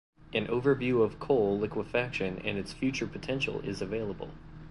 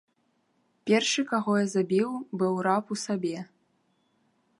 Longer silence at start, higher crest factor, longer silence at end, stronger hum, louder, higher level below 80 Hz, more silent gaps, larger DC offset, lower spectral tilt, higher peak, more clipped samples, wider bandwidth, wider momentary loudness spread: second, 0.2 s vs 0.85 s; about the same, 18 dB vs 20 dB; second, 0 s vs 1.15 s; neither; second, -31 LUFS vs -27 LUFS; first, -52 dBFS vs -78 dBFS; neither; neither; first, -6 dB/octave vs -4.5 dB/octave; second, -14 dBFS vs -10 dBFS; neither; about the same, 11.5 kHz vs 11.5 kHz; about the same, 8 LU vs 10 LU